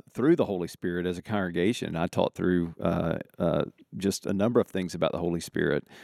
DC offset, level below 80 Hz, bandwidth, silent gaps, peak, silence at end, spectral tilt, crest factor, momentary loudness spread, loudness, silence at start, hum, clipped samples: under 0.1%; -60 dBFS; 14.5 kHz; none; -8 dBFS; 0 s; -6 dB/octave; 20 dB; 6 LU; -28 LUFS; 0.15 s; none; under 0.1%